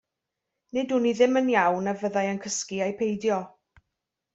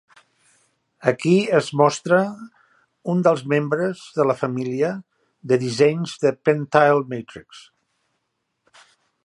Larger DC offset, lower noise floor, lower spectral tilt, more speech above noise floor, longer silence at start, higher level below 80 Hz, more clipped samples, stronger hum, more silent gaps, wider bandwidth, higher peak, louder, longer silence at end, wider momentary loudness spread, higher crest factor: neither; first, -85 dBFS vs -75 dBFS; second, -4.5 dB/octave vs -6 dB/octave; first, 60 dB vs 55 dB; second, 0.75 s vs 1 s; about the same, -68 dBFS vs -68 dBFS; neither; neither; neither; second, 8.2 kHz vs 11.5 kHz; second, -8 dBFS vs 0 dBFS; second, -25 LUFS vs -20 LUFS; second, 0.85 s vs 1.65 s; second, 9 LU vs 15 LU; about the same, 20 dB vs 20 dB